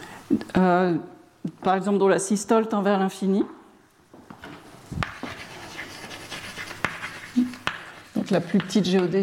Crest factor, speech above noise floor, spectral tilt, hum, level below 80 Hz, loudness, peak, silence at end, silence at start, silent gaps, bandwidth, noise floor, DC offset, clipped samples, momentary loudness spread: 22 dB; 33 dB; -5.5 dB/octave; none; -54 dBFS; -24 LUFS; -4 dBFS; 0 s; 0 s; none; 15.5 kHz; -55 dBFS; under 0.1%; under 0.1%; 17 LU